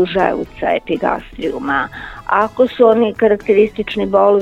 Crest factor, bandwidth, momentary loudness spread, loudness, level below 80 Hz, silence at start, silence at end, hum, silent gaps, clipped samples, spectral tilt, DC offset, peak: 14 dB; 7.8 kHz; 10 LU; -15 LUFS; -42 dBFS; 0 s; 0 s; none; none; under 0.1%; -7 dB/octave; under 0.1%; 0 dBFS